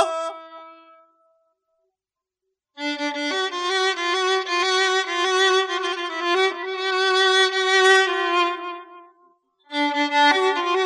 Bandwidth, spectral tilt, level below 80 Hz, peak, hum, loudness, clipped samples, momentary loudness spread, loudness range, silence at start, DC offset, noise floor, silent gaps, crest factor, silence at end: 11.5 kHz; 1 dB/octave; under -90 dBFS; -4 dBFS; none; -20 LUFS; under 0.1%; 12 LU; 10 LU; 0 s; under 0.1%; -87 dBFS; none; 18 dB; 0 s